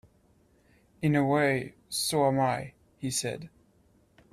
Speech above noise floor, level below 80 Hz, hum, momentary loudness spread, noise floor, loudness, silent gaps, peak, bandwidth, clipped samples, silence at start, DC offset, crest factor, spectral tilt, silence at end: 37 dB; -64 dBFS; none; 15 LU; -64 dBFS; -28 LUFS; none; -12 dBFS; 15 kHz; under 0.1%; 1 s; under 0.1%; 18 dB; -4.5 dB/octave; 0.85 s